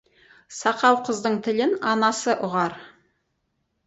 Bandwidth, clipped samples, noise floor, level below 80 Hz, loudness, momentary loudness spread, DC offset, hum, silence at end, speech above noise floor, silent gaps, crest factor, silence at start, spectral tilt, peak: 8.2 kHz; under 0.1%; -74 dBFS; -68 dBFS; -22 LUFS; 8 LU; under 0.1%; none; 1 s; 52 dB; none; 20 dB; 0.5 s; -4 dB/octave; -4 dBFS